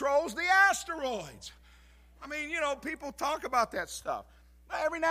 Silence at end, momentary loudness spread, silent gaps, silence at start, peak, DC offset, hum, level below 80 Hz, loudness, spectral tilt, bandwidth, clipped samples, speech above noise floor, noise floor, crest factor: 0 s; 17 LU; none; 0 s; -12 dBFS; under 0.1%; none; -58 dBFS; -30 LUFS; -2 dB/octave; 15.5 kHz; under 0.1%; 24 dB; -58 dBFS; 20 dB